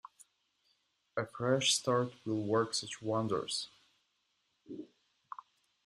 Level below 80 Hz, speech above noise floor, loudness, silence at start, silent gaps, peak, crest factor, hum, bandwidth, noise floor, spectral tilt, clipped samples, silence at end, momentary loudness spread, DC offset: -76 dBFS; 45 dB; -34 LUFS; 1.15 s; none; -16 dBFS; 20 dB; none; 13.5 kHz; -79 dBFS; -3.5 dB/octave; under 0.1%; 1 s; 22 LU; under 0.1%